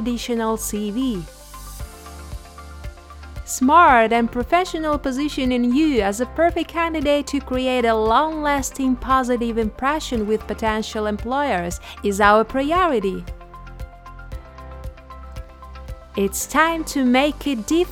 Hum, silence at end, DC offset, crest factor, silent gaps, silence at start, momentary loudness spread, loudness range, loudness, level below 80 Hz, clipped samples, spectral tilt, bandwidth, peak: none; 0 s; under 0.1%; 20 dB; none; 0 s; 21 LU; 9 LU; -20 LUFS; -38 dBFS; under 0.1%; -4.5 dB/octave; 17.5 kHz; -2 dBFS